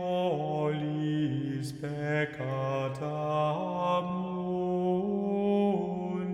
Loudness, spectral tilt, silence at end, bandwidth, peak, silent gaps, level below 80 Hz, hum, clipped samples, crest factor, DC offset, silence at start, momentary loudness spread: -31 LUFS; -8 dB/octave; 0 s; 12 kHz; -16 dBFS; none; -66 dBFS; none; under 0.1%; 14 dB; under 0.1%; 0 s; 5 LU